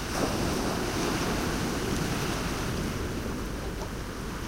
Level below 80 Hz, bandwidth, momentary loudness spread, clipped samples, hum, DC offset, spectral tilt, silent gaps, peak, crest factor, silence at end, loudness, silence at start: -38 dBFS; 16 kHz; 7 LU; under 0.1%; none; under 0.1%; -4.5 dB/octave; none; -14 dBFS; 16 dB; 0 s; -31 LUFS; 0 s